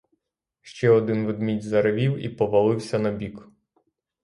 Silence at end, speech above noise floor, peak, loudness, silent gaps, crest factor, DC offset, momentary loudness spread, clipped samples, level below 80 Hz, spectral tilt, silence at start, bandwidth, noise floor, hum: 0.8 s; 56 dB; -8 dBFS; -23 LUFS; none; 16 dB; under 0.1%; 9 LU; under 0.1%; -58 dBFS; -7.5 dB/octave; 0.65 s; 11.5 kHz; -79 dBFS; none